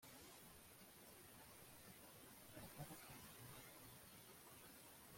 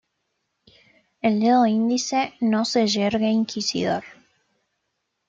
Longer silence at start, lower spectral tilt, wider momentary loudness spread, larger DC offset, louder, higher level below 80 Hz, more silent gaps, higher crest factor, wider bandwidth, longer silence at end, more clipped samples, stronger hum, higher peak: second, 0 s vs 1.25 s; second, -3 dB/octave vs -4.5 dB/octave; about the same, 5 LU vs 7 LU; neither; second, -60 LUFS vs -22 LUFS; second, -80 dBFS vs -66 dBFS; neither; about the same, 20 dB vs 16 dB; first, 16.5 kHz vs 7.8 kHz; second, 0 s vs 1.15 s; neither; neither; second, -42 dBFS vs -8 dBFS